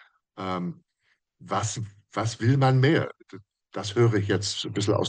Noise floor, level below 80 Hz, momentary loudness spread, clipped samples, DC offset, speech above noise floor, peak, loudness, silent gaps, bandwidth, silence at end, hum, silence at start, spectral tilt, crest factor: -72 dBFS; -66 dBFS; 15 LU; under 0.1%; under 0.1%; 47 dB; -8 dBFS; -26 LUFS; none; 9.8 kHz; 0 s; none; 0.35 s; -5.5 dB/octave; 18 dB